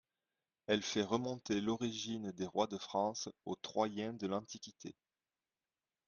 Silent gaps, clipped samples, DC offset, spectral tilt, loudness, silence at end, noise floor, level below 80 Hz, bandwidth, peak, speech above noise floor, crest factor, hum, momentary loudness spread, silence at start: none; under 0.1%; under 0.1%; -4.5 dB/octave; -39 LUFS; 1.15 s; under -90 dBFS; -76 dBFS; 7.4 kHz; -18 dBFS; over 51 dB; 22 dB; none; 13 LU; 0.7 s